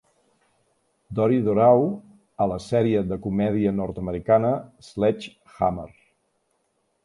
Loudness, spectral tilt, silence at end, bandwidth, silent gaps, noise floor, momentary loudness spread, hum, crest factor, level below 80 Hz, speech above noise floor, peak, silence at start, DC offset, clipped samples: -23 LUFS; -8.5 dB/octave; 1.15 s; 11.5 kHz; none; -71 dBFS; 16 LU; none; 20 dB; -50 dBFS; 49 dB; -4 dBFS; 1.1 s; under 0.1%; under 0.1%